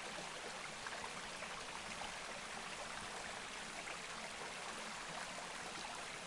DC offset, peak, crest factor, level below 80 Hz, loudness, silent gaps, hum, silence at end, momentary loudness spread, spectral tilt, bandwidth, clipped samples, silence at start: under 0.1%; -30 dBFS; 16 dB; -68 dBFS; -46 LUFS; none; none; 0 s; 1 LU; -1.5 dB/octave; 11.5 kHz; under 0.1%; 0 s